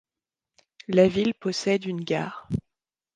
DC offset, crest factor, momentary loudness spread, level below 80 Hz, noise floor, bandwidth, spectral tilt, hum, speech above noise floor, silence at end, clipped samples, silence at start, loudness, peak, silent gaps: under 0.1%; 22 dB; 13 LU; -54 dBFS; under -90 dBFS; 9.6 kHz; -6 dB/octave; none; over 66 dB; 0.55 s; under 0.1%; 0.9 s; -25 LUFS; -6 dBFS; none